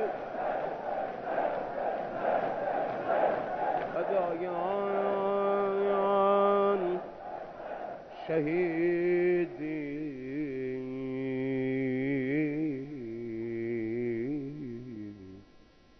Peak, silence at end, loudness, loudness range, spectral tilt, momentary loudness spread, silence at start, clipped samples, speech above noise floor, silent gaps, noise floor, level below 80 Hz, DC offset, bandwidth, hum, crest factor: -14 dBFS; 0.4 s; -31 LUFS; 5 LU; -9 dB/octave; 13 LU; 0 s; under 0.1%; 29 dB; none; -58 dBFS; -64 dBFS; under 0.1%; 6 kHz; none; 16 dB